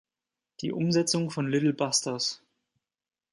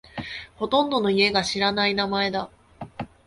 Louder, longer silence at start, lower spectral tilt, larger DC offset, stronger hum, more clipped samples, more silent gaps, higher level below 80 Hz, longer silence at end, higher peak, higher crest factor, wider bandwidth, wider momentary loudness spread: second, -27 LUFS vs -22 LUFS; first, 0.6 s vs 0.15 s; about the same, -4 dB/octave vs -4 dB/octave; neither; neither; neither; neither; second, -72 dBFS vs -54 dBFS; first, 0.95 s vs 0.2 s; second, -12 dBFS vs -6 dBFS; about the same, 18 dB vs 18 dB; about the same, 11.5 kHz vs 11.5 kHz; second, 10 LU vs 18 LU